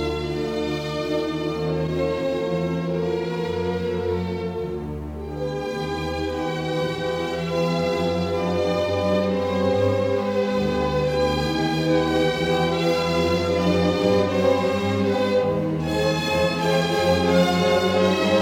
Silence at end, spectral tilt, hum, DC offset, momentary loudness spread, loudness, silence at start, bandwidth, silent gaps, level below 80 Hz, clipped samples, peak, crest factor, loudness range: 0 s; -6 dB/octave; none; under 0.1%; 7 LU; -22 LUFS; 0 s; 17 kHz; none; -44 dBFS; under 0.1%; -6 dBFS; 16 dB; 6 LU